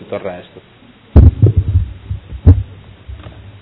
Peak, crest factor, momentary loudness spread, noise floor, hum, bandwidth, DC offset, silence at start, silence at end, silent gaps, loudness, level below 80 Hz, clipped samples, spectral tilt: 0 dBFS; 14 dB; 24 LU; -34 dBFS; none; 4 kHz; under 0.1%; 0.1 s; 0.45 s; none; -13 LUFS; -18 dBFS; 3%; -12.5 dB/octave